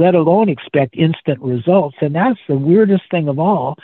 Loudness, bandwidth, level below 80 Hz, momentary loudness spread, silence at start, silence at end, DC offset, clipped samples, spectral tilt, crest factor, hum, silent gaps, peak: -15 LUFS; 4.2 kHz; -58 dBFS; 7 LU; 0 s; 0.1 s; under 0.1%; under 0.1%; -11 dB/octave; 14 dB; none; none; -2 dBFS